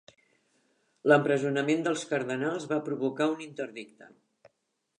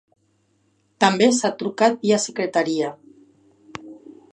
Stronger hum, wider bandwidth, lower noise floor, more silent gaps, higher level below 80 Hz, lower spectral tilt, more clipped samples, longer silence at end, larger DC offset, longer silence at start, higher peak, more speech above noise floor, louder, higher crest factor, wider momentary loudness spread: neither; about the same, 10.5 kHz vs 10.5 kHz; first, -79 dBFS vs -65 dBFS; neither; second, -84 dBFS vs -70 dBFS; first, -5.5 dB/octave vs -4 dB/octave; neither; first, 0.95 s vs 0.25 s; neither; about the same, 1.05 s vs 1 s; second, -6 dBFS vs -2 dBFS; first, 51 dB vs 46 dB; second, -29 LUFS vs -20 LUFS; about the same, 24 dB vs 22 dB; second, 15 LU vs 22 LU